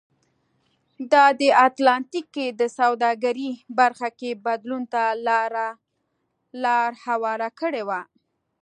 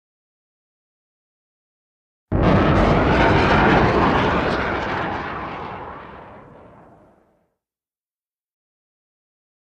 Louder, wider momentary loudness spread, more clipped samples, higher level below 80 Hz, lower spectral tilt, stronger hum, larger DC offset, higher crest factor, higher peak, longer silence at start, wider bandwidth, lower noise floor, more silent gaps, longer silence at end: second, -22 LUFS vs -18 LUFS; second, 13 LU vs 17 LU; neither; second, -82 dBFS vs -32 dBFS; second, -3 dB/octave vs -7.5 dB/octave; neither; neither; about the same, 20 dB vs 18 dB; about the same, -2 dBFS vs -2 dBFS; second, 1 s vs 2.3 s; about the same, 10 kHz vs 9.2 kHz; second, -74 dBFS vs under -90 dBFS; neither; second, 0.6 s vs 3.2 s